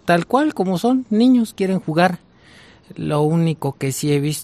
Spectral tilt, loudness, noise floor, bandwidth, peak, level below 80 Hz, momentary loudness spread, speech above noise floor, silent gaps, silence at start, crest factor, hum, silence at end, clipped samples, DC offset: -6 dB/octave; -18 LUFS; -47 dBFS; 15 kHz; -2 dBFS; -58 dBFS; 8 LU; 29 dB; none; 0.05 s; 16 dB; none; 0 s; under 0.1%; under 0.1%